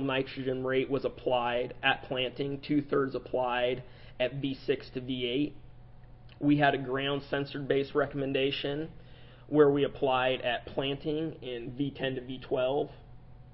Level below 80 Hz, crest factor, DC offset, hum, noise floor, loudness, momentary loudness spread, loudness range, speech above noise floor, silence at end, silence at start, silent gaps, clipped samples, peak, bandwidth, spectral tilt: -54 dBFS; 20 dB; under 0.1%; none; -50 dBFS; -31 LUFS; 10 LU; 3 LU; 20 dB; 0.05 s; 0 s; none; under 0.1%; -12 dBFS; 5.8 kHz; -9.5 dB/octave